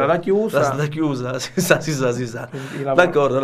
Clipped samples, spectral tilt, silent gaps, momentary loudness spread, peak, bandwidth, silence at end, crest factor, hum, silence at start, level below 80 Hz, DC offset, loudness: under 0.1%; -5.5 dB/octave; none; 11 LU; 0 dBFS; 15.5 kHz; 0 s; 18 dB; none; 0 s; -54 dBFS; under 0.1%; -19 LUFS